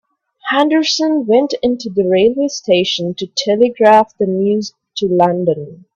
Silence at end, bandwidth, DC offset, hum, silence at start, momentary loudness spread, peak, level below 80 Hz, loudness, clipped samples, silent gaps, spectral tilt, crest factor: 0.2 s; 8.2 kHz; under 0.1%; none; 0.45 s; 9 LU; 0 dBFS; -58 dBFS; -14 LUFS; under 0.1%; none; -5 dB/octave; 14 dB